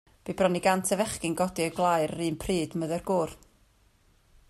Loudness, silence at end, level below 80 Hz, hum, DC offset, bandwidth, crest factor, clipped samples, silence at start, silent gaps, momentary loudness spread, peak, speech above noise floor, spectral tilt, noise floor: -28 LUFS; 1.15 s; -54 dBFS; none; under 0.1%; 15.5 kHz; 18 dB; under 0.1%; 0.25 s; none; 7 LU; -10 dBFS; 36 dB; -4.5 dB/octave; -63 dBFS